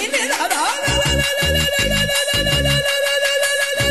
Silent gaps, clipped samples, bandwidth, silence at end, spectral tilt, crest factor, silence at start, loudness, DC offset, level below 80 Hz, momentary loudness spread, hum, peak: none; under 0.1%; 13 kHz; 0 s; -2.5 dB/octave; 14 dB; 0 s; -16 LUFS; 0.5%; -30 dBFS; 2 LU; none; -4 dBFS